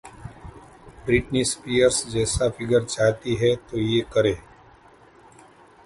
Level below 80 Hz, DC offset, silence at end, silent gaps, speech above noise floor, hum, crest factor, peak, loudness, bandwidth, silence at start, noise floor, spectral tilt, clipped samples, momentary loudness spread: -44 dBFS; under 0.1%; 1.45 s; none; 30 dB; none; 18 dB; -6 dBFS; -22 LUFS; 11.5 kHz; 0.05 s; -52 dBFS; -4.5 dB/octave; under 0.1%; 15 LU